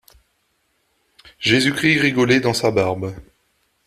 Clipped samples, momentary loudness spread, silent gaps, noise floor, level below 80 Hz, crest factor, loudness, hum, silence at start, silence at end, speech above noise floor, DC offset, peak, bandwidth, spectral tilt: under 0.1%; 8 LU; none; -67 dBFS; -52 dBFS; 18 dB; -17 LUFS; none; 1.4 s; 0.65 s; 49 dB; under 0.1%; -2 dBFS; 14.5 kHz; -4.5 dB/octave